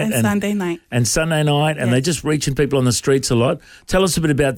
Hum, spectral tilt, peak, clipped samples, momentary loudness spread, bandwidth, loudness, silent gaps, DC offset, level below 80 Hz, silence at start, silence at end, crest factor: none; -5 dB/octave; -4 dBFS; under 0.1%; 5 LU; 18.5 kHz; -18 LUFS; none; under 0.1%; -38 dBFS; 0 s; 0 s; 12 dB